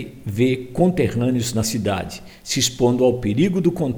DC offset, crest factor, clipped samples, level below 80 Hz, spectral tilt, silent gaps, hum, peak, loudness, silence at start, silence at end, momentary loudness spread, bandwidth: under 0.1%; 16 dB; under 0.1%; -42 dBFS; -5 dB/octave; none; none; -4 dBFS; -20 LUFS; 0 s; 0 s; 8 LU; over 20 kHz